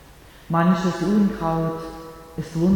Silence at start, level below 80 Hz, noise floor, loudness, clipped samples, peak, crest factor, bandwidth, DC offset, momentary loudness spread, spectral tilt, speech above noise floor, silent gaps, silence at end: 0.1 s; -46 dBFS; -46 dBFS; -22 LUFS; under 0.1%; -8 dBFS; 14 dB; 18 kHz; under 0.1%; 16 LU; -7.5 dB/octave; 26 dB; none; 0 s